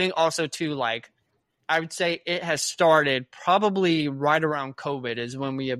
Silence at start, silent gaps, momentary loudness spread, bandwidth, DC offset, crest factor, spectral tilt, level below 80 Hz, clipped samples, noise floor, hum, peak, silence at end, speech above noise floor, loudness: 0 s; none; 10 LU; 15 kHz; under 0.1%; 20 dB; -4 dB/octave; -70 dBFS; under 0.1%; -73 dBFS; none; -6 dBFS; 0 s; 48 dB; -24 LUFS